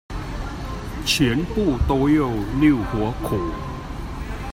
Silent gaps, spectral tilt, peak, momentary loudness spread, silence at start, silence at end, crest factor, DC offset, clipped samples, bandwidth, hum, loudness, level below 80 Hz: none; -5.5 dB/octave; -6 dBFS; 13 LU; 0.1 s; 0 s; 16 dB; under 0.1%; under 0.1%; 16 kHz; none; -22 LUFS; -32 dBFS